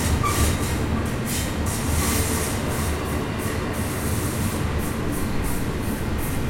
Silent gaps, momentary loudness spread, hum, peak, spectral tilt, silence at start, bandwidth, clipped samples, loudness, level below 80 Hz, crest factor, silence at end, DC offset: none; 5 LU; none; -8 dBFS; -4.5 dB/octave; 0 s; 16.5 kHz; under 0.1%; -24 LUFS; -32 dBFS; 14 dB; 0 s; under 0.1%